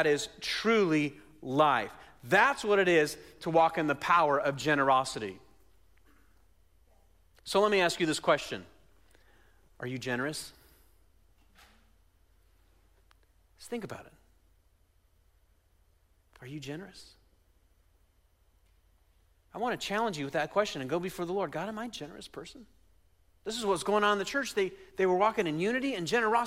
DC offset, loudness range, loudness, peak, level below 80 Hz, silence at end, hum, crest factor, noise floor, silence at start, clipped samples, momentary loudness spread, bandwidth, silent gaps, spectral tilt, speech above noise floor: under 0.1%; 22 LU; -29 LUFS; -12 dBFS; -64 dBFS; 0 s; none; 20 dB; -67 dBFS; 0 s; under 0.1%; 18 LU; 16 kHz; none; -4 dB/octave; 38 dB